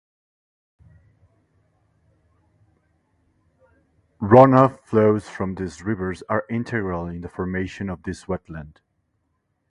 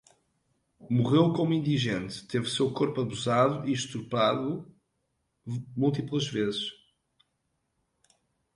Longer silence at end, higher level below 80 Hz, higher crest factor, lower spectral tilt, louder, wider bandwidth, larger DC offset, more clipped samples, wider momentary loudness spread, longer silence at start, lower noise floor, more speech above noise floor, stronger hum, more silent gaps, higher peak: second, 1 s vs 1.8 s; first, -48 dBFS vs -64 dBFS; about the same, 24 dB vs 20 dB; first, -8.5 dB/octave vs -6 dB/octave; first, -21 LUFS vs -28 LUFS; about the same, 11 kHz vs 11.5 kHz; neither; neither; first, 18 LU vs 11 LU; first, 4.2 s vs 0.8 s; second, -72 dBFS vs -78 dBFS; about the same, 52 dB vs 50 dB; neither; neither; first, 0 dBFS vs -10 dBFS